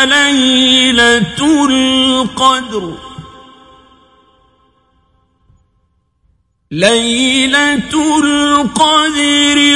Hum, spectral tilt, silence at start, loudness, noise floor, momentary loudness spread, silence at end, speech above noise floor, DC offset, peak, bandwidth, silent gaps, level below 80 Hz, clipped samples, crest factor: none; -2.5 dB/octave; 0 s; -10 LUFS; -59 dBFS; 9 LU; 0 s; 49 dB; under 0.1%; 0 dBFS; 11.5 kHz; none; -44 dBFS; under 0.1%; 12 dB